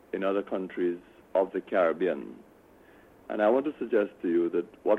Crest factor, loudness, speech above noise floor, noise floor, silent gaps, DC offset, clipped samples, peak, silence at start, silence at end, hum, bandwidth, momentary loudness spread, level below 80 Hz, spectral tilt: 18 dB; -29 LUFS; 28 dB; -56 dBFS; none; under 0.1%; under 0.1%; -12 dBFS; 0.15 s; 0 s; none; 4.1 kHz; 9 LU; -70 dBFS; -8 dB/octave